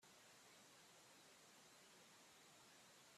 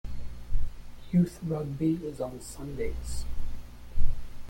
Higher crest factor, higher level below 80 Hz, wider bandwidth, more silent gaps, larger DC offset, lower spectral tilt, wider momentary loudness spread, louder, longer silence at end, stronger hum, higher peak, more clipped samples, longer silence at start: about the same, 14 dB vs 18 dB; second, under -90 dBFS vs -34 dBFS; first, 14 kHz vs 10.5 kHz; neither; neither; second, -1.5 dB/octave vs -7.5 dB/octave; second, 0 LU vs 17 LU; second, -66 LUFS vs -33 LUFS; about the same, 0 s vs 0 s; second, none vs 60 Hz at -45 dBFS; second, -54 dBFS vs -8 dBFS; neither; about the same, 0 s vs 0.05 s